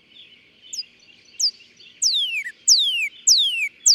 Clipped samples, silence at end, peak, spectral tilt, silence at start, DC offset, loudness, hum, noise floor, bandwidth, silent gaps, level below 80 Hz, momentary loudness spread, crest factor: under 0.1%; 0 s; -4 dBFS; 6 dB/octave; 0.75 s; under 0.1%; -17 LUFS; none; -52 dBFS; 16.5 kHz; none; -80 dBFS; 17 LU; 18 dB